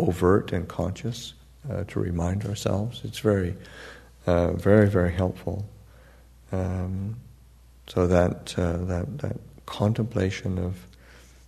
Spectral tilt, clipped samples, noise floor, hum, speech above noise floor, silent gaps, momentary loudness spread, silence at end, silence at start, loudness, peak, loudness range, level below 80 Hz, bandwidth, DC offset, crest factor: -7 dB/octave; under 0.1%; -52 dBFS; none; 27 dB; none; 17 LU; 0.3 s; 0 s; -26 LUFS; -4 dBFS; 4 LU; -46 dBFS; 13.5 kHz; under 0.1%; 22 dB